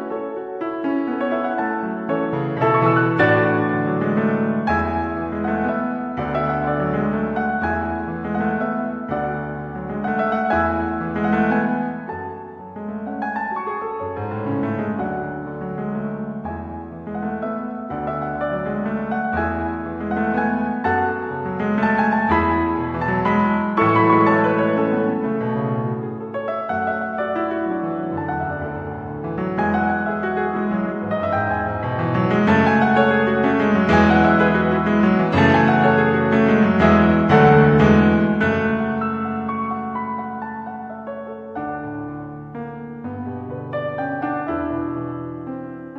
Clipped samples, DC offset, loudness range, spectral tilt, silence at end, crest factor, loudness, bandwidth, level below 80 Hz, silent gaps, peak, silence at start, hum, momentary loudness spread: under 0.1%; under 0.1%; 11 LU; -8.5 dB/octave; 0 s; 20 dB; -20 LUFS; 6.6 kHz; -42 dBFS; none; 0 dBFS; 0 s; none; 14 LU